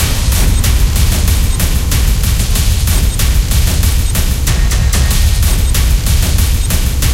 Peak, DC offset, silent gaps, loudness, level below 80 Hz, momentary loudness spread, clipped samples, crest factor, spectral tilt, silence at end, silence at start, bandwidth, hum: 0 dBFS; under 0.1%; none; -13 LUFS; -12 dBFS; 2 LU; under 0.1%; 10 dB; -4 dB/octave; 0 s; 0 s; 17 kHz; none